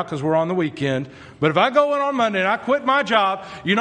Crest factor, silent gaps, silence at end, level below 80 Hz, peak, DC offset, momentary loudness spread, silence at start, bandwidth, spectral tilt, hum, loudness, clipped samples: 18 dB; none; 0 s; -62 dBFS; -2 dBFS; under 0.1%; 7 LU; 0 s; 9.6 kHz; -6 dB/octave; none; -20 LUFS; under 0.1%